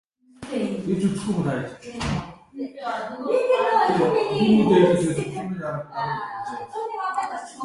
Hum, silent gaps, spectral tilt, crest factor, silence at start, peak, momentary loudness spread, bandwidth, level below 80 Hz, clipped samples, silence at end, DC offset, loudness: none; none; -6.5 dB/octave; 18 dB; 0.4 s; -4 dBFS; 14 LU; 11.5 kHz; -50 dBFS; under 0.1%; 0 s; under 0.1%; -23 LUFS